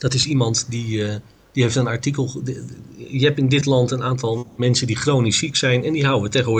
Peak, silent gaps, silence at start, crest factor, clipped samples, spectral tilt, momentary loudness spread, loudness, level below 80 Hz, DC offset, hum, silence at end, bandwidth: -4 dBFS; none; 0 s; 14 dB; under 0.1%; -5 dB/octave; 11 LU; -20 LUFS; -50 dBFS; under 0.1%; none; 0 s; 9.6 kHz